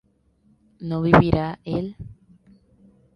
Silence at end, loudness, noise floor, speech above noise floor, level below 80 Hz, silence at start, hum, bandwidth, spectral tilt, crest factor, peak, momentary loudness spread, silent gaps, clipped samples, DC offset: 1 s; -21 LUFS; -62 dBFS; 42 dB; -42 dBFS; 0.8 s; none; 6.2 kHz; -9 dB/octave; 24 dB; 0 dBFS; 23 LU; none; under 0.1%; under 0.1%